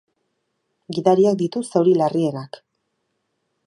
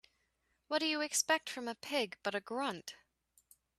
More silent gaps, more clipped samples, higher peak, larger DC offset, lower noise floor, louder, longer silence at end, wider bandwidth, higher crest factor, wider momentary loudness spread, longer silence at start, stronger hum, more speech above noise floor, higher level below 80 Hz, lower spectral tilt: neither; neither; first, -2 dBFS vs -16 dBFS; neither; second, -73 dBFS vs -80 dBFS; first, -19 LUFS vs -36 LUFS; first, 1.1 s vs 0.85 s; second, 11 kHz vs 14.5 kHz; about the same, 20 dB vs 22 dB; first, 14 LU vs 10 LU; first, 0.9 s vs 0.7 s; neither; first, 55 dB vs 43 dB; first, -70 dBFS vs -84 dBFS; first, -7 dB/octave vs -1 dB/octave